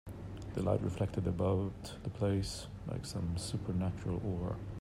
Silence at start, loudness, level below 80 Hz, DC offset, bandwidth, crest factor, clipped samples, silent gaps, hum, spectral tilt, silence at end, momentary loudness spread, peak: 0.05 s; -37 LUFS; -52 dBFS; under 0.1%; 13 kHz; 18 dB; under 0.1%; none; none; -7 dB/octave; 0 s; 9 LU; -18 dBFS